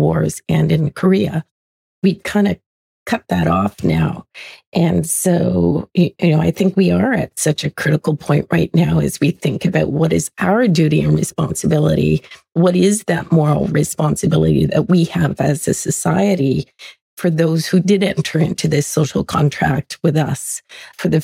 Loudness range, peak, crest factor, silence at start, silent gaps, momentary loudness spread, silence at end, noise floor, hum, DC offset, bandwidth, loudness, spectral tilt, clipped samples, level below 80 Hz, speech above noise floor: 3 LU; -4 dBFS; 12 dB; 0 s; 1.51-2.02 s, 2.66-3.06 s, 4.67-4.72 s, 17.01-17.17 s; 7 LU; 0 s; under -90 dBFS; none; under 0.1%; 16 kHz; -16 LUFS; -6 dB/octave; under 0.1%; -42 dBFS; over 74 dB